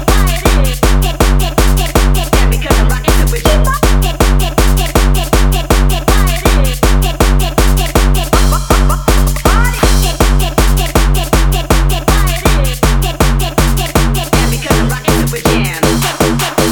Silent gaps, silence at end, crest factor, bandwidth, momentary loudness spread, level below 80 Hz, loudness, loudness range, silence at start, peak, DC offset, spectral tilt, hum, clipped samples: none; 0 s; 10 dB; over 20 kHz; 1 LU; -12 dBFS; -12 LUFS; 1 LU; 0 s; 0 dBFS; under 0.1%; -4.5 dB/octave; none; under 0.1%